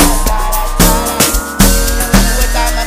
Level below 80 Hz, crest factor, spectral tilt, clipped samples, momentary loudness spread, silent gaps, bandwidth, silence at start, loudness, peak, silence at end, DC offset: -14 dBFS; 10 dB; -3.5 dB/octave; 0.3%; 5 LU; none; 16.5 kHz; 0 s; -11 LUFS; 0 dBFS; 0 s; under 0.1%